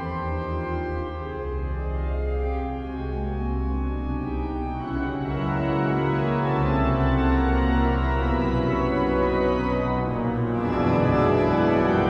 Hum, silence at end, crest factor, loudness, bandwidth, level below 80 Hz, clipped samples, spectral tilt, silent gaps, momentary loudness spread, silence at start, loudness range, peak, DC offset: none; 0 s; 14 dB; -24 LUFS; 6 kHz; -30 dBFS; under 0.1%; -9 dB/octave; none; 9 LU; 0 s; 6 LU; -8 dBFS; under 0.1%